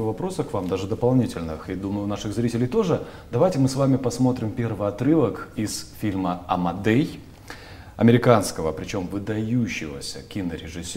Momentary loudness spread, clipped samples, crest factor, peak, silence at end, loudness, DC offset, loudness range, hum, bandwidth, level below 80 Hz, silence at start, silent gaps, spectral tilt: 11 LU; under 0.1%; 22 dB; 0 dBFS; 0 s; -24 LUFS; under 0.1%; 2 LU; none; 16 kHz; -48 dBFS; 0 s; none; -6.5 dB/octave